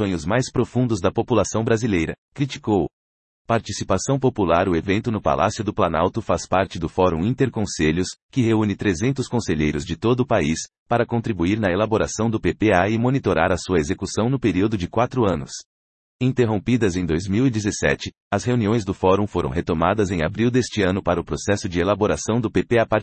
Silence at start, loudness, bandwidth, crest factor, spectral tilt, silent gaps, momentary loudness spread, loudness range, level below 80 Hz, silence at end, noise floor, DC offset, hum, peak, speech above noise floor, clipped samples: 0 s; -21 LUFS; 9 kHz; 18 dB; -6 dB/octave; 2.18-2.32 s, 2.93-3.45 s, 8.22-8.29 s, 10.79-10.86 s, 15.65-16.19 s, 18.20-18.31 s; 5 LU; 2 LU; -44 dBFS; 0 s; under -90 dBFS; under 0.1%; none; -4 dBFS; over 69 dB; under 0.1%